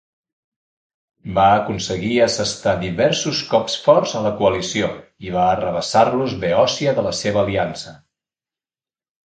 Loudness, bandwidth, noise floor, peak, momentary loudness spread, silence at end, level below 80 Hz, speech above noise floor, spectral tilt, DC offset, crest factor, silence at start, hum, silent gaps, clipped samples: -18 LUFS; 9.4 kHz; under -90 dBFS; 0 dBFS; 9 LU; 1.3 s; -46 dBFS; over 72 dB; -4.5 dB/octave; under 0.1%; 18 dB; 1.25 s; none; none; under 0.1%